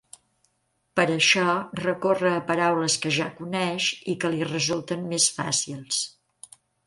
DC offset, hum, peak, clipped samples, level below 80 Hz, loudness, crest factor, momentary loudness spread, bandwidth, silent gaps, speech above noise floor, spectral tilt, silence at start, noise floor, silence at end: under 0.1%; none; -4 dBFS; under 0.1%; -68 dBFS; -24 LUFS; 20 dB; 9 LU; 11.5 kHz; none; 48 dB; -3 dB/octave; 0.95 s; -72 dBFS; 0.8 s